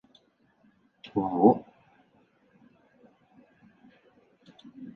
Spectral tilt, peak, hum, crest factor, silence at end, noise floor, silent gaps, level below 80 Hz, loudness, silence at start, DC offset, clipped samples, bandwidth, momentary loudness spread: -10.5 dB/octave; -6 dBFS; none; 26 dB; 0.05 s; -66 dBFS; none; -70 dBFS; -25 LUFS; 1.05 s; under 0.1%; under 0.1%; 5.6 kHz; 29 LU